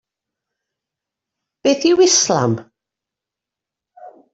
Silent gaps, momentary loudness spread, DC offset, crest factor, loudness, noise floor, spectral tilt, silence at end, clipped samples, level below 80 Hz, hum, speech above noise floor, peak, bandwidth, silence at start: none; 9 LU; under 0.1%; 18 dB; -15 LUFS; -86 dBFS; -3.5 dB/octave; 0.25 s; under 0.1%; -64 dBFS; none; 71 dB; -2 dBFS; 8 kHz; 1.65 s